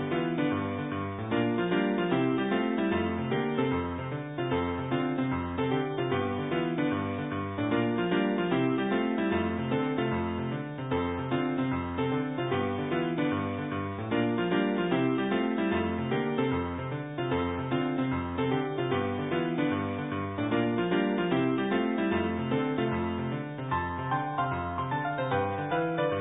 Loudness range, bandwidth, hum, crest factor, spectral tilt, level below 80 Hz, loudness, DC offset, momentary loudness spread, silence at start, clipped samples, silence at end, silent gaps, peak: 2 LU; 4 kHz; none; 14 dB; -11 dB/octave; -50 dBFS; -30 LUFS; under 0.1%; 5 LU; 0 s; under 0.1%; 0 s; none; -14 dBFS